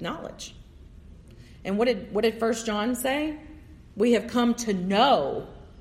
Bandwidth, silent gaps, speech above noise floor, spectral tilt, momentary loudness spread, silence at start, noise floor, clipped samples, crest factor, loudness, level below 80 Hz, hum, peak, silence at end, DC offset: 15.5 kHz; none; 23 dB; -4.5 dB/octave; 19 LU; 0 s; -48 dBFS; under 0.1%; 18 dB; -25 LUFS; -52 dBFS; none; -8 dBFS; 0 s; under 0.1%